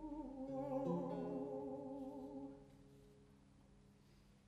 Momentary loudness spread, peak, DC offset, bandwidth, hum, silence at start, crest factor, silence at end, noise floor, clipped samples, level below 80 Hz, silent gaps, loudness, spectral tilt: 25 LU; -30 dBFS; under 0.1%; 11.5 kHz; none; 0 s; 20 dB; 0 s; -68 dBFS; under 0.1%; -70 dBFS; none; -47 LUFS; -9 dB/octave